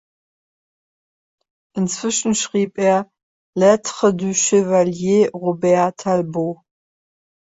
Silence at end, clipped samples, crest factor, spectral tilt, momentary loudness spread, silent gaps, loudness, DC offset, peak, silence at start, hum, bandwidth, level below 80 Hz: 1.05 s; under 0.1%; 16 dB; -4.5 dB/octave; 9 LU; 3.23-3.53 s; -18 LUFS; under 0.1%; -2 dBFS; 1.75 s; none; 8 kHz; -60 dBFS